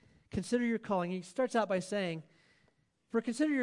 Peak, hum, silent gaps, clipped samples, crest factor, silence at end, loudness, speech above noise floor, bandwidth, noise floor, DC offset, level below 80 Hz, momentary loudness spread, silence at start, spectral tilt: -18 dBFS; none; none; under 0.1%; 16 dB; 0 s; -34 LUFS; 40 dB; 11.5 kHz; -73 dBFS; under 0.1%; -66 dBFS; 7 LU; 0.35 s; -5.5 dB/octave